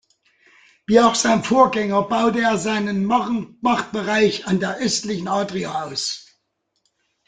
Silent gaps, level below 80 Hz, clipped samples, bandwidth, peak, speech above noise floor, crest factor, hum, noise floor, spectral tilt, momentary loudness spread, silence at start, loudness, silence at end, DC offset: none; -56 dBFS; under 0.1%; 9.6 kHz; -2 dBFS; 53 dB; 18 dB; none; -72 dBFS; -4 dB/octave; 9 LU; 0.9 s; -19 LUFS; 1.1 s; under 0.1%